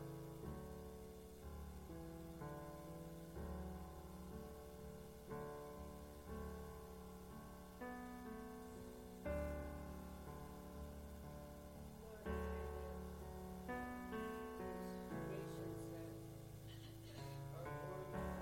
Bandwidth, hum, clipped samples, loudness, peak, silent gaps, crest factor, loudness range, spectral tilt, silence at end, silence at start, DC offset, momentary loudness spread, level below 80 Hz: 16 kHz; 60 Hz at -65 dBFS; under 0.1%; -52 LUFS; -34 dBFS; none; 18 dB; 4 LU; -6.5 dB/octave; 0 s; 0 s; under 0.1%; 8 LU; -58 dBFS